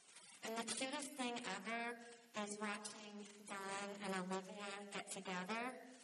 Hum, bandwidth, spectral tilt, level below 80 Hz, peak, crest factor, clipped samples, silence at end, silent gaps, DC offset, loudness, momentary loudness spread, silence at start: none; 13 kHz; -3 dB/octave; under -90 dBFS; -30 dBFS; 18 dB; under 0.1%; 0 s; none; under 0.1%; -47 LUFS; 8 LU; 0 s